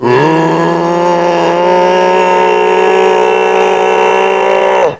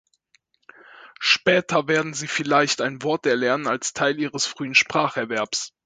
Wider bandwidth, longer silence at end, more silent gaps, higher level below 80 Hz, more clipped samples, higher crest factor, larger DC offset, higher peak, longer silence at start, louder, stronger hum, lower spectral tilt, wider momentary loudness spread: second, 8 kHz vs 9.6 kHz; second, 0 s vs 0.2 s; neither; first, -54 dBFS vs -66 dBFS; first, 0.2% vs under 0.1%; second, 8 dB vs 22 dB; first, 0.4% vs under 0.1%; about the same, 0 dBFS vs -2 dBFS; second, 0 s vs 1 s; first, -9 LUFS vs -21 LUFS; neither; first, -5.5 dB/octave vs -3 dB/octave; second, 2 LU vs 7 LU